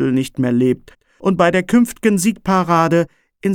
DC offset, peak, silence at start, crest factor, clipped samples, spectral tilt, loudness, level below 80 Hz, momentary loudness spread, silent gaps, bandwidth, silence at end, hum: under 0.1%; -2 dBFS; 0 s; 14 dB; under 0.1%; -6 dB/octave; -16 LUFS; -48 dBFS; 8 LU; none; 17.5 kHz; 0 s; none